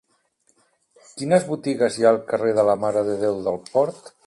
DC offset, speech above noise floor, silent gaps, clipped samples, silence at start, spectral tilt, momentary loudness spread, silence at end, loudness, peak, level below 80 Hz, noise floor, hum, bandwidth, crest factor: under 0.1%; 45 dB; none; under 0.1%; 1.15 s; -5.5 dB/octave; 8 LU; 0.15 s; -21 LUFS; -4 dBFS; -64 dBFS; -65 dBFS; none; 11.5 kHz; 18 dB